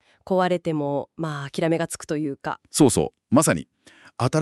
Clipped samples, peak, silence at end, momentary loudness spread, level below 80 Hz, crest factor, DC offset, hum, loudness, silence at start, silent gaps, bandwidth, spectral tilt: under 0.1%; -4 dBFS; 0 s; 10 LU; -54 dBFS; 20 dB; under 0.1%; none; -23 LUFS; 0.25 s; none; 13.5 kHz; -5 dB/octave